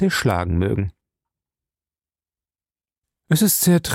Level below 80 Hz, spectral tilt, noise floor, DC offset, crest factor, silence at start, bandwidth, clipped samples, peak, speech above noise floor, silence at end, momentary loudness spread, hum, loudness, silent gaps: -46 dBFS; -5 dB/octave; under -90 dBFS; under 0.1%; 16 dB; 0 s; 16.5 kHz; under 0.1%; -6 dBFS; over 72 dB; 0 s; 9 LU; none; -19 LUFS; 2.98-3.02 s